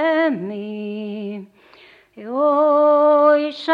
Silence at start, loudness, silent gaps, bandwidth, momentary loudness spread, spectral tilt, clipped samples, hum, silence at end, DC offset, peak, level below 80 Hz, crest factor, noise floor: 0 s; -17 LUFS; none; 5.4 kHz; 16 LU; -7 dB/octave; under 0.1%; none; 0 s; under 0.1%; -4 dBFS; -74 dBFS; 16 dB; -49 dBFS